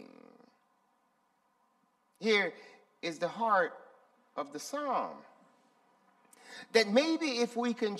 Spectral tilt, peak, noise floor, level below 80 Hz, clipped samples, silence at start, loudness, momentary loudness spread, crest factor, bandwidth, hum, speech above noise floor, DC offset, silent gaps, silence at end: -3.5 dB/octave; -10 dBFS; -74 dBFS; -86 dBFS; under 0.1%; 0 s; -32 LUFS; 17 LU; 24 dB; 13.5 kHz; none; 43 dB; under 0.1%; none; 0 s